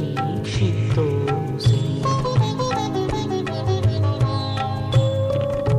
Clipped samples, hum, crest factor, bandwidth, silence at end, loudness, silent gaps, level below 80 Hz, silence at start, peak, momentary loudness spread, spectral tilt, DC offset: under 0.1%; none; 14 dB; 10.5 kHz; 0 s; -21 LUFS; none; -40 dBFS; 0 s; -6 dBFS; 4 LU; -7 dB/octave; under 0.1%